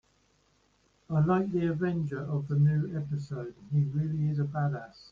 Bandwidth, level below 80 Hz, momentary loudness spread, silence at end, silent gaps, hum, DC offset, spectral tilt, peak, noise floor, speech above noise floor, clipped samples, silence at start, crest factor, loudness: 5 kHz; -60 dBFS; 9 LU; 0.1 s; none; none; under 0.1%; -10 dB/octave; -16 dBFS; -69 dBFS; 40 dB; under 0.1%; 1.1 s; 14 dB; -30 LUFS